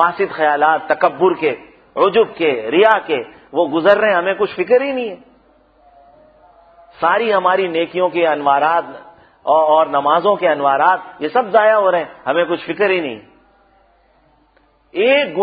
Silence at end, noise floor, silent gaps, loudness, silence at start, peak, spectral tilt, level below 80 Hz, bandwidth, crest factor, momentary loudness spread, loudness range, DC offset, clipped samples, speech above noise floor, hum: 0 s; -55 dBFS; none; -15 LUFS; 0 s; 0 dBFS; -7.5 dB/octave; -60 dBFS; 5 kHz; 16 dB; 9 LU; 5 LU; under 0.1%; under 0.1%; 41 dB; none